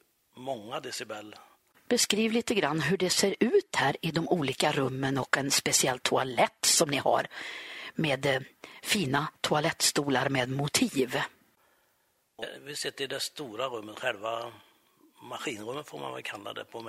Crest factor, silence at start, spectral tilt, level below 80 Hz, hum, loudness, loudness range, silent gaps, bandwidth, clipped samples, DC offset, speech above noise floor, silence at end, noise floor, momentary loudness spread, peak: 24 dB; 0.35 s; -3 dB/octave; -66 dBFS; none; -29 LUFS; 10 LU; none; 16 kHz; under 0.1%; under 0.1%; 42 dB; 0 s; -72 dBFS; 14 LU; -6 dBFS